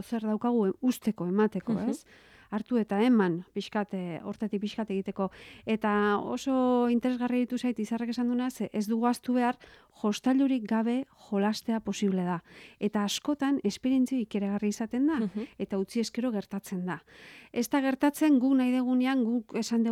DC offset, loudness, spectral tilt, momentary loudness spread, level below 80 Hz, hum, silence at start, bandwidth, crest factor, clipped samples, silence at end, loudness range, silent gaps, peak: under 0.1%; -29 LUFS; -6 dB/octave; 9 LU; -68 dBFS; none; 0 s; 15.5 kHz; 16 dB; under 0.1%; 0 s; 3 LU; none; -14 dBFS